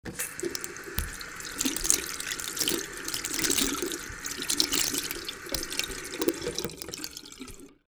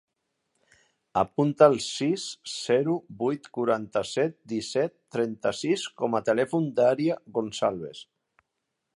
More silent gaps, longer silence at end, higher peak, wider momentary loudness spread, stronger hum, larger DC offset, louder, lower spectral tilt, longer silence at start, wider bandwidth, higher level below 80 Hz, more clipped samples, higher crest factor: neither; second, 0.15 s vs 0.95 s; first, 0 dBFS vs -4 dBFS; about the same, 12 LU vs 10 LU; neither; neither; about the same, -29 LUFS vs -27 LUFS; second, -1.5 dB/octave vs -5 dB/octave; second, 0.05 s vs 1.15 s; first, over 20 kHz vs 11.5 kHz; first, -48 dBFS vs -68 dBFS; neither; first, 32 dB vs 24 dB